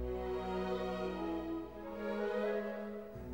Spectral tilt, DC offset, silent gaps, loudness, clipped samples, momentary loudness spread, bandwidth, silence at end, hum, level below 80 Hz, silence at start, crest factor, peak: -7 dB/octave; under 0.1%; none; -40 LUFS; under 0.1%; 7 LU; 16 kHz; 0 s; none; -54 dBFS; 0 s; 14 dB; -26 dBFS